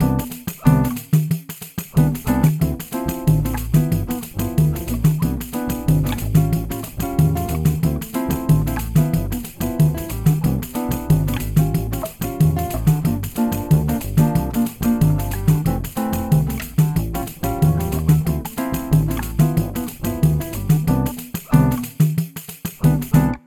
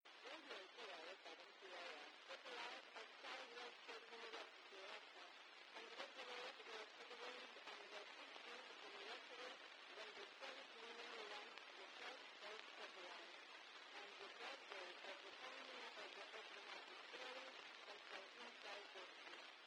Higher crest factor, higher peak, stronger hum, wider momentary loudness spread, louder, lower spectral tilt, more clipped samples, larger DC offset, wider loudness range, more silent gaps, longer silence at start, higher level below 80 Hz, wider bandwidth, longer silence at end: second, 18 dB vs 24 dB; first, -2 dBFS vs -34 dBFS; neither; first, 7 LU vs 4 LU; first, -20 LUFS vs -56 LUFS; first, -7 dB/octave vs 0 dB/octave; neither; neither; about the same, 1 LU vs 1 LU; neither; about the same, 0 s vs 0.05 s; first, -30 dBFS vs under -90 dBFS; about the same, 19 kHz vs 18 kHz; about the same, 0.1 s vs 0 s